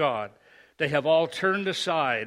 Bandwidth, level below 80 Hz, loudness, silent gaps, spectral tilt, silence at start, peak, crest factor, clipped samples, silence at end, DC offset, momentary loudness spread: 12.5 kHz; -70 dBFS; -25 LUFS; none; -4.5 dB/octave; 0 s; -8 dBFS; 18 dB; under 0.1%; 0 s; under 0.1%; 9 LU